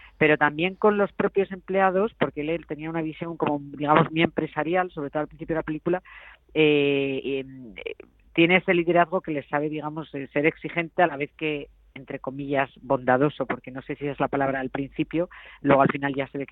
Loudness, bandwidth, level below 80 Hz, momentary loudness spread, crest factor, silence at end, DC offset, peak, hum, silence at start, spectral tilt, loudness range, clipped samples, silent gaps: -25 LUFS; 4.1 kHz; -56 dBFS; 13 LU; 22 dB; 0.05 s; under 0.1%; -4 dBFS; none; 0.05 s; -9.5 dB/octave; 4 LU; under 0.1%; none